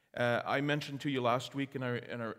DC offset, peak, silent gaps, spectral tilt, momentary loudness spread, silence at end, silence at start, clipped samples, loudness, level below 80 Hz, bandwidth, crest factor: under 0.1%; -16 dBFS; none; -6 dB/octave; 6 LU; 0 s; 0.15 s; under 0.1%; -34 LUFS; -76 dBFS; 16 kHz; 18 dB